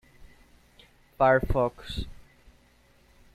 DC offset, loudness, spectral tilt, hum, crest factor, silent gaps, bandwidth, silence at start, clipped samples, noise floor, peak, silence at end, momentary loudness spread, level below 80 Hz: under 0.1%; -26 LUFS; -7 dB/octave; none; 20 dB; none; 15 kHz; 0.2 s; under 0.1%; -61 dBFS; -10 dBFS; 1.2 s; 15 LU; -42 dBFS